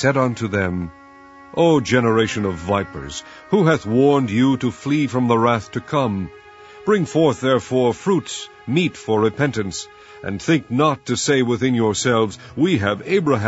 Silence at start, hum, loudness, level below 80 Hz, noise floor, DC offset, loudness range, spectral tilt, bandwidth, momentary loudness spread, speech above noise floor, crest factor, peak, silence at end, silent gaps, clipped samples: 0 s; none; -19 LUFS; -50 dBFS; -43 dBFS; under 0.1%; 2 LU; -5.5 dB/octave; 8 kHz; 12 LU; 25 dB; 18 dB; -2 dBFS; 0 s; none; under 0.1%